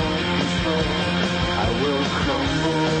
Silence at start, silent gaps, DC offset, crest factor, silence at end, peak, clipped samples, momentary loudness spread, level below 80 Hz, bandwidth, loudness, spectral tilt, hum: 0 s; none; under 0.1%; 12 dB; 0 s; -10 dBFS; under 0.1%; 1 LU; -36 dBFS; 8.8 kHz; -21 LUFS; -5 dB/octave; none